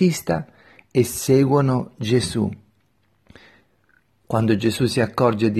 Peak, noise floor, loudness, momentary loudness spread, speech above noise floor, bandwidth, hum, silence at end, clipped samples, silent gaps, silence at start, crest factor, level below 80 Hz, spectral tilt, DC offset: -2 dBFS; -64 dBFS; -20 LUFS; 9 LU; 45 dB; 14 kHz; none; 0 s; under 0.1%; none; 0 s; 18 dB; -52 dBFS; -6 dB/octave; under 0.1%